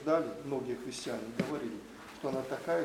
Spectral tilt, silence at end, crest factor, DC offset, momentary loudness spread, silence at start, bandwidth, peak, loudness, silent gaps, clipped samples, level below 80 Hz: -5.5 dB/octave; 0 s; 20 dB; under 0.1%; 9 LU; 0 s; 17 kHz; -16 dBFS; -37 LUFS; none; under 0.1%; -68 dBFS